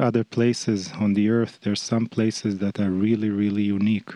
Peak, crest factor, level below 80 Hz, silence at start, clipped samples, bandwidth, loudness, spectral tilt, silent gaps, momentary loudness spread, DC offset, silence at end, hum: -8 dBFS; 14 dB; -68 dBFS; 0 s; under 0.1%; 10.5 kHz; -23 LUFS; -6 dB/octave; none; 4 LU; under 0.1%; 0 s; none